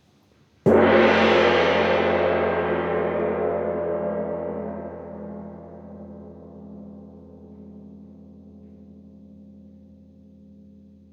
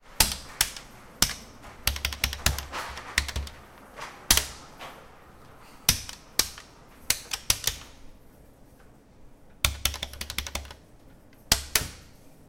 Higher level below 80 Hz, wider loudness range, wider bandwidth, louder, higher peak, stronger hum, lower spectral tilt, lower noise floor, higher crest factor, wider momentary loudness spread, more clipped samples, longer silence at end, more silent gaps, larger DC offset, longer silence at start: second, -54 dBFS vs -40 dBFS; first, 25 LU vs 4 LU; second, 7.8 kHz vs 17 kHz; first, -21 LUFS vs -27 LUFS; second, -6 dBFS vs -2 dBFS; neither; first, -6.5 dB/octave vs -1 dB/octave; first, -59 dBFS vs -53 dBFS; second, 18 dB vs 30 dB; first, 26 LU vs 20 LU; neither; first, 1.6 s vs 0.05 s; neither; neither; first, 0.65 s vs 0.05 s